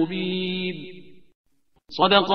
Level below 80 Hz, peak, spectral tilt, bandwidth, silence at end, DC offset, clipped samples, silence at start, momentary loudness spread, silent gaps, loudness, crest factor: -60 dBFS; 0 dBFS; -6.5 dB/octave; 6.4 kHz; 0 s; under 0.1%; under 0.1%; 0 s; 19 LU; 1.35-1.44 s; -23 LUFS; 24 dB